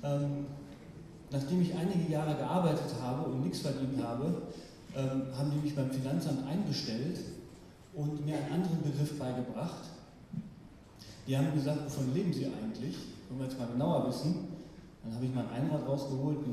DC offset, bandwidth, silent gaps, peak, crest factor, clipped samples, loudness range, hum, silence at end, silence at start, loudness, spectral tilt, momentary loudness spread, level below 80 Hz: under 0.1%; 14.5 kHz; none; -18 dBFS; 18 dB; under 0.1%; 3 LU; none; 0 s; 0 s; -35 LUFS; -7 dB/octave; 17 LU; -62 dBFS